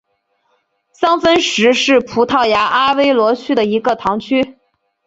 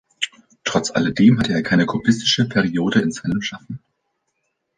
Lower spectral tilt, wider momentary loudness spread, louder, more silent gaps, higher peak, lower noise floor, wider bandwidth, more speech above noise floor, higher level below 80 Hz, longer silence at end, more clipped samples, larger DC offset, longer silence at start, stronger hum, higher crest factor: second, -3.5 dB/octave vs -5 dB/octave; second, 6 LU vs 13 LU; first, -14 LUFS vs -19 LUFS; neither; about the same, 0 dBFS vs -2 dBFS; second, -64 dBFS vs -73 dBFS; second, 8 kHz vs 9.6 kHz; second, 51 dB vs 55 dB; about the same, -52 dBFS vs -50 dBFS; second, 0.55 s vs 1 s; neither; neither; first, 1 s vs 0.2 s; neither; about the same, 14 dB vs 16 dB